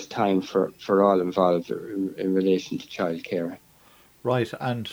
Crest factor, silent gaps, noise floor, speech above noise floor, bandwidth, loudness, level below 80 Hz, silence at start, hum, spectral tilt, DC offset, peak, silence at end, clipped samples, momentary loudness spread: 18 dB; none; -56 dBFS; 31 dB; over 20 kHz; -25 LUFS; -66 dBFS; 0 s; none; -7 dB/octave; under 0.1%; -6 dBFS; 0 s; under 0.1%; 11 LU